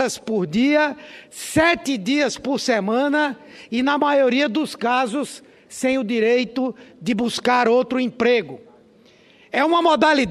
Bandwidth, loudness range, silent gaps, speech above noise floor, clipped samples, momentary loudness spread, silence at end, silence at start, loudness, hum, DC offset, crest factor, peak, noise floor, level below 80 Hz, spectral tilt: 13.5 kHz; 2 LU; none; 32 dB; under 0.1%; 11 LU; 0 s; 0 s; -20 LUFS; none; under 0.1%; 18 dB; -4 dBFS; -52 dBFS; -56 dBFS; -4 dB/octave